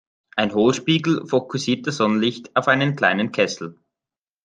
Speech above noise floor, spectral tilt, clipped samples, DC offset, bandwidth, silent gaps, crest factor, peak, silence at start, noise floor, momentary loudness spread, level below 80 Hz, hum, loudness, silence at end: over 70 dB; -5 dB/octave; under 0.1%; under 0.1%; 9.6 kHz; none; 20 dB; -2 dBFS; 0.35 s; under -90 dBFS; 6 LU; -64 dBFS; none; -20 LUFS; 0.75 s